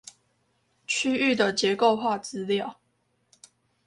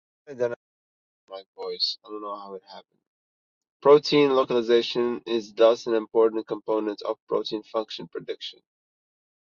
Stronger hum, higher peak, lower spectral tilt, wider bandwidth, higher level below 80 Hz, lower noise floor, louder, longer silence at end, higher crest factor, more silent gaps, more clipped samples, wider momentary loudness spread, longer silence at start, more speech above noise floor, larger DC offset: neither; about the same, -8 dBFS vs -6 dBFS; second, -3.5 dB/octave vs -5 dB/octave; first, 11.5 kHz vs 7.2 kHz; about the same, -70 dBFS vs -74 dBFS; second, -72 dBFS vs under -90 dBFS; about the same, -25 LUFS vs -24 LUFS; about the same, 1.15 s vs 1.05 s; about the same, 18 dB vs 20 dB; second, none vs 0.56-1.28 s, 1.46-1.54 s, 3.07-3.61 s, 3.70-3.80 s, 7.22-7.27 s; neither; second, 9 LU vs 19 LU; first, 0.9 s vs 0.3 s; second, 47 dB vs over 66 dB; neither